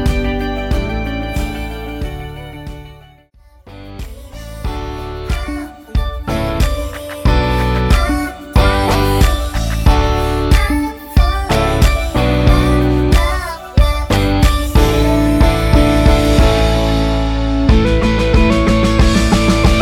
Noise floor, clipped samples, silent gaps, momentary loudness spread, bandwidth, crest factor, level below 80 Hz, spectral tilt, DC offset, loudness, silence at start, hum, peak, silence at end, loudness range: -45 dBFS; under 0.1%; none; 13 LU; 16.5 kHz; 14 dB; -16 dBFS; -6 dB/octave; under 0.1%; -15 LUFS; 0 s; none; 0 dBFS; 0 s; 14 LU